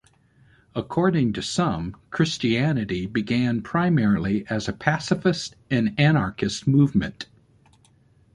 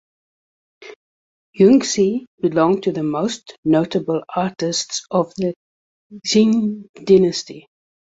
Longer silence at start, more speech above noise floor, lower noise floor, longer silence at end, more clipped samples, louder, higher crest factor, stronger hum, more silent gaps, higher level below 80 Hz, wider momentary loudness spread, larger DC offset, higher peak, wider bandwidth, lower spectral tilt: about the same, 0.75 s vs 0.8 s; second, 36 dB vs over 72 dB; second, -58 dBFS vs under -90 dBFS; first, 1.1 s vs 0.6 s; neither; second, -23 LUFS vs -18 LUFS; about the same, 20 dB vs 18 dB; neither; second, none vs 0.96-1.53 s, 2.27-2.38 s, 3.58-3.63 s, 5.56-6.10 s, 6.89-6.94 s; first, -48 dBFS vs -60 dBFS; about the same, 10 LU vs 11 LU; neither; about the same, -2 dBFS vs -2 dBFS; first, 11.5 kHz vs 8 kHz; about the same, -6 dB/octave vs -5 dB/octave